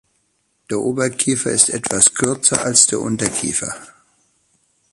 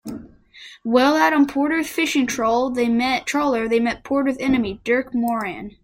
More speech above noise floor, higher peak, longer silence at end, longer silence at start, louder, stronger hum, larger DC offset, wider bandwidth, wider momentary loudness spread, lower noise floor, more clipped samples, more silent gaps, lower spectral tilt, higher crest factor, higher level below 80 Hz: first, 48 dB vs 25 dB; first, 0 dBFS vs -4 dBFS; first, 1.05 s vs 0.15 s; first, 0.7 s vs 0.05 s; first, -15 LUFS vs -20 LUFS; neither; neither; about the same, 16 kHz vs 16.5 kHz; first, 10 LU vs 7 LU; first, -66 dBFS vs -44 dBFS; neither; neither; second, -2.5 dB/octave vs -4 dB/octave; about the same, 20 dB vs 18 dB; about the same, -52 dBFS vs -52 dBFS